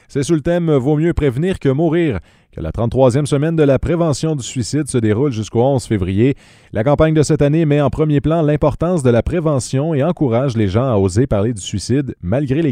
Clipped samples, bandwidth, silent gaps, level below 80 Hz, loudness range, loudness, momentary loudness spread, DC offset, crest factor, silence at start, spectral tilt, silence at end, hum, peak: under 0.1%; 11.5 kHz; none; -34 dBFS; 2 LU; -16 LUFS; 6 LU; under 0.1%; 14 dB; 0.1 s; -7 dB/octave; 0 s; none; 0 dBFS